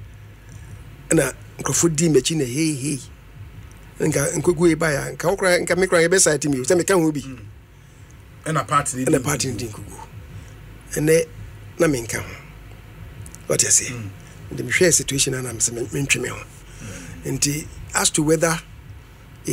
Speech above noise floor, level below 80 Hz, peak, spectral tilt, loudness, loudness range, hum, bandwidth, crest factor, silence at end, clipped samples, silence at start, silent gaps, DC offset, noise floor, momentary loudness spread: 25 dB; -44 dBFS; -2 dBFS; -3.5 dB/octave; -20 LUFS; 6 LU; none; 16 kHz; 20 dB; 0 s; under 0.1%; 0 s; none; under 0.1%; -45 dBFS; 23 LU